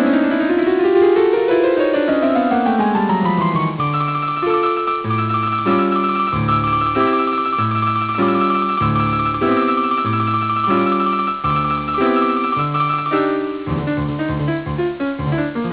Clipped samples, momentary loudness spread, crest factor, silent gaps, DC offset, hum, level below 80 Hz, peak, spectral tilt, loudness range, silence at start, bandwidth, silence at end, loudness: under 0.1%; 5 LU; 12 dB; none; under 0.1%; none; -42 dBFS; -4 dBFS; -10.5 dB/octave; 3 LU; 0 s; 4 kHz; 0 s; -17 LUFS